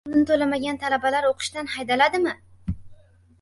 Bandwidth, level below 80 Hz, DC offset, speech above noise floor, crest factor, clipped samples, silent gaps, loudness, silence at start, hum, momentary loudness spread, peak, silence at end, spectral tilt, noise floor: 11.5 kHz; -46 dBFS; under 0.1%; 27 dB; 20 dB; under 0.1%; none; -23 LUFS; 0.05 s; none; 14 LU; -4 dBFS; 0.5 s; -4.5 dB/octave; -50 dBFS